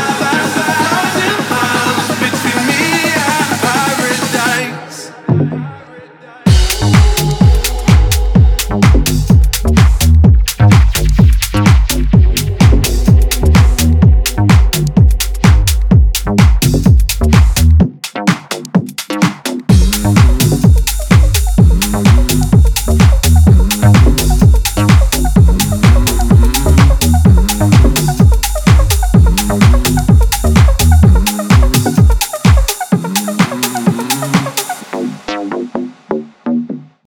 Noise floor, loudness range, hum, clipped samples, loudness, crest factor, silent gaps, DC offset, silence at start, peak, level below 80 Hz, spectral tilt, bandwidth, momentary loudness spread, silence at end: -35 dBFS; 4 LU; none; under 0.1%; -11 LUFS; 10 dB; none; under 0.1%; 0 s; 0 dBFS; -14 dBFS; -5 dB/octave; 20 kHz; 7 LU; 0.35 s